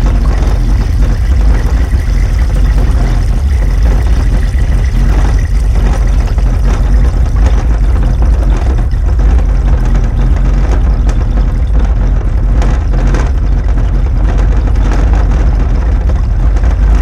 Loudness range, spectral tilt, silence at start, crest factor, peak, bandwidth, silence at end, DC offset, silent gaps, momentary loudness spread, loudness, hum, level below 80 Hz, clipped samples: 1 LU; -7.5 dB/octave; 0 s; 8 dB; 0 dBFS; 7.2 kHz; 0 s; under 0.1%; none; 2 LU; -12 LUFS; none; -8 dBFS; under 0.1%